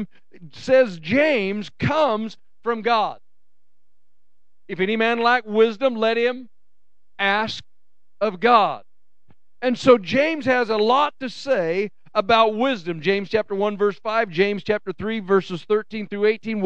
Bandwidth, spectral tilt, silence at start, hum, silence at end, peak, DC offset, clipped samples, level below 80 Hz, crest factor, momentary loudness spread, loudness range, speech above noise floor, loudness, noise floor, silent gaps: 8.6 kHz; -5.5 dB/octave; 0 s; none; 0 s; -2 dBFS; 0.8%; under 0.1%; -60 dBFS; 20 dB; 10 LU; 4 LU; 60 dB; -21 LUFS; -80 dBFS; none